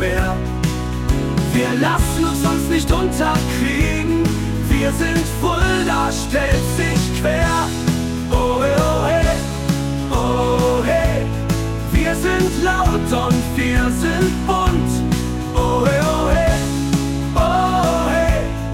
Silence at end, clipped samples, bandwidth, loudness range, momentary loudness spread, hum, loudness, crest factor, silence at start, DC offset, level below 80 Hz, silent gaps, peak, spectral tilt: 0 s; under 0.1%; 16.5 kHz; 1 LU; 4 LU; none; -18 LUFS; 12 dB; 0 s; under 0.1%; -24 dBFS; none; -4 dBFS; -5.5 dB/octave